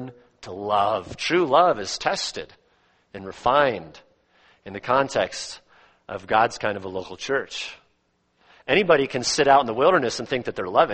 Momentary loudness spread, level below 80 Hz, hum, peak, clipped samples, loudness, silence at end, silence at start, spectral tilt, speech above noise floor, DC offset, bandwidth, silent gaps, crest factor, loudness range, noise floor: 20 LU; -56 dBFS; none; -4 dBFS; under 0.1%; -22 LUFS; 0 s; 0 s; -3.5 dB/octave; 46 dB; under 0.1%; 8.8 kHz; none; 20 dB; 5 LU; -68 dBFS